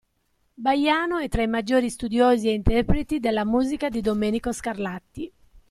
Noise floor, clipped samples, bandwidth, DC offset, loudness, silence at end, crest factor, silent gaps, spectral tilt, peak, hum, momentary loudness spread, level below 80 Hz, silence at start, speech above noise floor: -69 dBFS; under 0.1%; 13.5 kHz; under 0.1%; -23 LUFS; 0.4 s; 18 dB; none; -5.5 dB/octave; -4 dBFS; none; 11 LU; -36 dBFS; 0.6 s; 46 dB